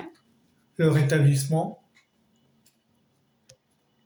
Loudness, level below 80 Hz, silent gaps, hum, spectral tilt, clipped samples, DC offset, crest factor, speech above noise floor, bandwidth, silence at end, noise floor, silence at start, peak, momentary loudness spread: -23 LUFS; -66 dBFS; none; none; -6.5 dB/octave; under 0.1%; under 0.1%; 18 dB; 47 dB; over 20 kHz; 2.3 s; -69 dBFS; 0 s; -10 dBFS; 20 LU